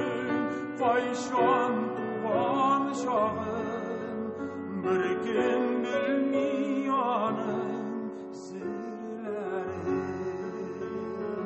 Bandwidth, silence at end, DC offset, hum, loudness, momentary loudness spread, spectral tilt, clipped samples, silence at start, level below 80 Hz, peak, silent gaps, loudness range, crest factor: 8.4 kHz; 0 s; under 0.1%; none; -30 LUFS; 10 LU; -6 dB/octave; under 0.1%; 0 s; -62 dBFS; -14 dBFS; none; 7 LU; 16 dB